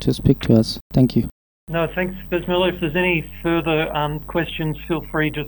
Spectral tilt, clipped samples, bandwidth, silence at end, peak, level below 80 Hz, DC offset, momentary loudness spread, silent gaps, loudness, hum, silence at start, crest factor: -7 dB/octave; under 0.1%; 19 kHz; 0 s; -2 dBFS; -38 dBFS; under 0.1%; 8 LU; 0.81-0.90 s, 1.32-1.67 s; -20 LUFS; none; 0 s; 20 dB